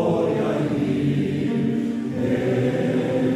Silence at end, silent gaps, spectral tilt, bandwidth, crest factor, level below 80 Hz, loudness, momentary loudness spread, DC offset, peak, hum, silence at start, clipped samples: 0 s; none; -8 dB/octave; 12 kHz; 12 dB; -54 dBFS; -22 LUFS; 2 LU; under 0.1%; -10 dBFS; none; 0 s; under 0.1%